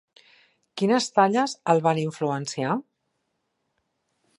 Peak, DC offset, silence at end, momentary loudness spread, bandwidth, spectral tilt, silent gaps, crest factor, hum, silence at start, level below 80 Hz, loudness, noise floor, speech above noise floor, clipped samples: -4 dBFS; under 0.1%; 1.6 s; 8 LU; 11.5 kHz; -5 dB/octave; none; 22 dB; none; 0.75 s; -76 dBFS; -24 LUFS; -76 dBFS; 53 dB; under 0.1%